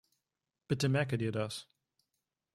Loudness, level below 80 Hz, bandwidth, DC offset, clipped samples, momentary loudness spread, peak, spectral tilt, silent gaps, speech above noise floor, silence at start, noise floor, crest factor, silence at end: -34 LUFS; -68 dBFS; 15 kHz; under 0.1%; under 0.1%; 9 LU; -18 dBFS; -6 dB/octave; none; 57 dB; 0.7 s; -90 dBFS; 20 dB; 0.9 s